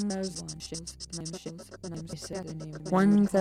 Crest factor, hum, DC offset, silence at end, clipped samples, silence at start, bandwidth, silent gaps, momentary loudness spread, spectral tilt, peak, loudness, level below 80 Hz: 16 dB; none; under 0.1%; 0 s; under 0.1%; 0 s; 12.5 kHz; none; 18 LU; -5.5 dB/octave; -14 dBFS; -31 LUFS; -56 dBFS